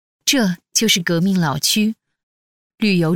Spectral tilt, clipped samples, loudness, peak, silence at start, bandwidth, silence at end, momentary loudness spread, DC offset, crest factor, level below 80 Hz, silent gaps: -3.5 dB/octave; under 0.1%; -17 LUFS; -2 dBFS; 0.25 s; 18.5 kHz; 0 s; 6 LU; under 0.1%; 18 dB; -56 dBFS; 2.23-2.70 s